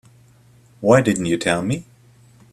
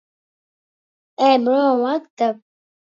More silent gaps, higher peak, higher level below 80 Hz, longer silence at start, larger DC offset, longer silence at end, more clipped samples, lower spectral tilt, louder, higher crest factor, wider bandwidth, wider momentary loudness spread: second, none vs 2.10-2.17 s; about the same, 0 dBFS vs -2 dBFS; first, -54 dBFS vs -78 dBFS; second, 0.8 s vs 1.2 s; neither; first, 0.7 s vs 0.55 s; neither; about the same, -5.5 dB/octave vs -5 dB/octave; about the same, -19 LUFS vs -18 LUFS; about the same, 20 dB vs 18 dB; first, 14 kHz vs 7.4 kHz; first, 10 LU vs 7 LU